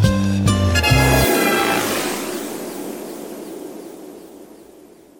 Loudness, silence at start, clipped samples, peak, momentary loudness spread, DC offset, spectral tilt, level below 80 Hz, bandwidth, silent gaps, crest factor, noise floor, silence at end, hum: -17 LUFS; 0 s; under 0.1%; -2 dBFS; 21 LU; under 0.1%; -4.5 dB/octave; -32 dBFS; 17 kHz; none; 18 dB; -45 dBFS; 0.4 s; none